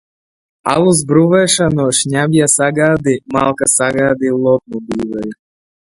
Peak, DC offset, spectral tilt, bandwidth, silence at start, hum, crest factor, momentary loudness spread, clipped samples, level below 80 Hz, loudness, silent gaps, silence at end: 0 dBFS; under 0.1%; -4.5 dB/octave; 12 kHz; 0.65 s; none; 14 dB; 10 LU; under 0.1%; -46 dBFS; -13 LUFS; none; 0.6 s